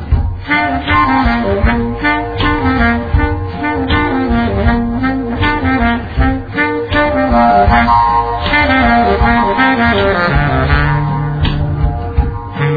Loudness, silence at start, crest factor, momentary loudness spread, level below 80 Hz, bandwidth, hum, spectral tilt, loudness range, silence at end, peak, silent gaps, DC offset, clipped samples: -13 LUFS; 0 s; 12 dB; 7 LU; -20 dBFS; 5 kHz; none; -9 dB/octave; 4 LU; 0 s; 0 dBFS; none; 0.2%; under 0.1%